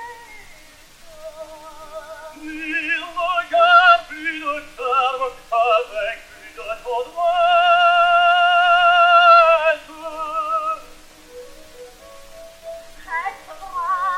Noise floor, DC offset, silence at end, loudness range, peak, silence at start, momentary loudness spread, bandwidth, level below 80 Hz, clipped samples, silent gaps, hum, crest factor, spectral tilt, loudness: -45 dBFS; under 0.1%; 0 s; 15 LU; -2 dBFS; 0 s; 25 LU; 14 kHz; -50 dBFS; under 0.1%; none; none; 18 dB; -1.5 dB/octave; -16 LUFS